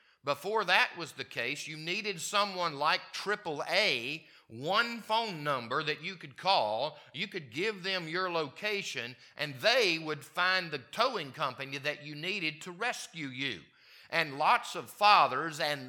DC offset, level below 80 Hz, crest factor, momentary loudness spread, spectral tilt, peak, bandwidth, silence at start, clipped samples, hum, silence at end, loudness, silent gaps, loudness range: under 0.1%; -86 dBFS; 24 dB; 12 LU; -3 dB/octave; -8 dBFS; 19 kHz; 0.25 s; under 0.1%; none; 0 s; -31 LUFS; none; 3 LU